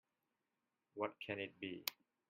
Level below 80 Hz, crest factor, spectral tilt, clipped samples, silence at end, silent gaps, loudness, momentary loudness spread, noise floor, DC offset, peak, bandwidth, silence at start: -88 dBFS; 30 dB; -3.5 dB/octave; under 0.1%; 0.35 s; none; -46 LUFS; 3 LU; -90 dBFS; under 0.1%; -18 dBFS; 13.5 kHz; 0.95 s